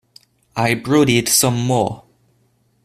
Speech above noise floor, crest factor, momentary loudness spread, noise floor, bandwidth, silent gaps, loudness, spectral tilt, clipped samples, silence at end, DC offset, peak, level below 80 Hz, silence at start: 45 dB; 18 dB; 12 LU; -61 dBFS; 15.5 kHz; none; -16 LUFS; -4 dB/octave; under 0.1%; 0.85 s; under 0.1%; 0 dBFS; -52 dBFS; 0.55 s